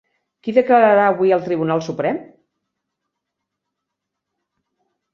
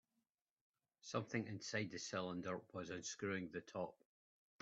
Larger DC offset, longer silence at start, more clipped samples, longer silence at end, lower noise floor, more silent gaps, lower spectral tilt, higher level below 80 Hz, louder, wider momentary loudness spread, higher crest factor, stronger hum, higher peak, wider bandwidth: neither; second, 0.45 s vs 1.05 s; neither; first, 2.9 s vs 0.7 s; second, -80 dBFS vs under -90 dBFS; neither; first, -7 dB/octave vs -4.5 dB/octave; first, -68 dBFS vs -84 dBFS; first, -16 LUFS vs -47 LUFS; first, 10 LU vs 5 LU; about the same, 18 dB vs 22 dB; neither; first, -2 dBFS vs -26 dBFS; second, 7 kHz vs 8.2 kHz